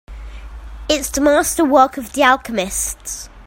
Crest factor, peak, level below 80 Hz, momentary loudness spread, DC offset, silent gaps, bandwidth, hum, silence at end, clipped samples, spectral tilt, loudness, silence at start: 18 dB; 0 dBFS; -36 dBFS; 22 LU; under 0.1%; none; 16.5 kHz; none; 0 s; under 0.1%; -2.5 dB/octave; -16 LUFS; 0.1 s